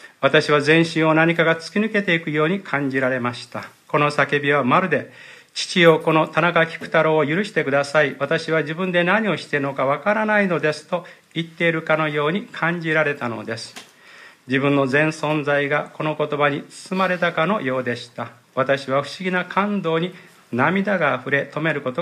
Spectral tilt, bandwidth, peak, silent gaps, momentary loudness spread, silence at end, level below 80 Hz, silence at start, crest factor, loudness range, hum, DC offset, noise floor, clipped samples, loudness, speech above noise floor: -5.5 dB/octave; 14 kHz; 0 dBFS; none; 12 LU; 0 s; -70 dBFS; 0.05 s; 20 dB; 4 LU; none; under 0.1%; -46 dBFS; under 0.1%; -20 LUFS; 26 dB